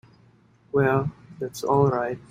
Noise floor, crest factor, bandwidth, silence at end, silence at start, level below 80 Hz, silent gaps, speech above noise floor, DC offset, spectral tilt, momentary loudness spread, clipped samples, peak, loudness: -57 dBFS; 20 dB; 15.5 kHz; 0.1 s; 0.75 s; -54 dBFS; none; 34 dB; under 0.1%; -7 dB/octave; 13 LU; under 0.1%; -6 dBFS; -24 LUFS